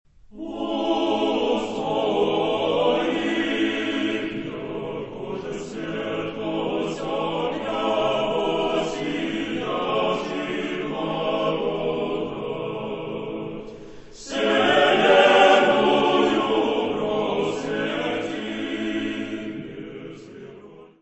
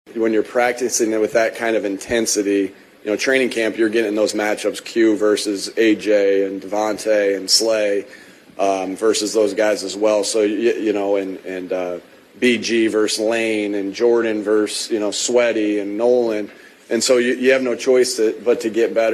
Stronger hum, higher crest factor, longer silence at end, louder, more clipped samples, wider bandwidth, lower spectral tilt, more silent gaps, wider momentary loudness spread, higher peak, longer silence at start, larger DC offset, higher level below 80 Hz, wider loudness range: neither; about the same, 20 dB vs 16 dB; first, 0.15 s vs 0 s; second, -23 LUFS vs -18 LUFS; neither; second, 8.4 kHz vs 13.5 kHz; first, -5 dB/octave vs -2.5 dB/octave; neither; first, 15 LU vs 7 LU; about the same, -4 dBFS vs -2 dBFS; first, 0.3 s vs 0.1 s; neither; first, -54 dBFS vs -62 dBFS; first, 10 LU vs 2 LU